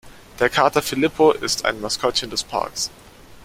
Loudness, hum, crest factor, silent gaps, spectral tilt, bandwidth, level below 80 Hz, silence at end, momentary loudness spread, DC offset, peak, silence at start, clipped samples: -20 LUFS; none; 20 dB; none; -3 dB/octave; 16 kHz; -48 dBFS; 0 s; 9 LU; under 0.1%; -2 dBFS; 0.05 s; under 0.1%